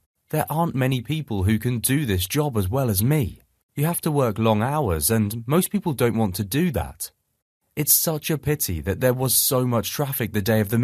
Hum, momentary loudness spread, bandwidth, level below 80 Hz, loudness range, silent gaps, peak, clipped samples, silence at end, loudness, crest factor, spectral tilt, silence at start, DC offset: none; 8 LU; 14.5 kHz; -44 dBFS; 2 LU; 3.63-3.69 s, 7.42-7.60 s; -4 dBFS; under 0.1%; 0 s; -22 LUFS; 20 dB; -5 dB/octave; 0.3 s; under 0.1%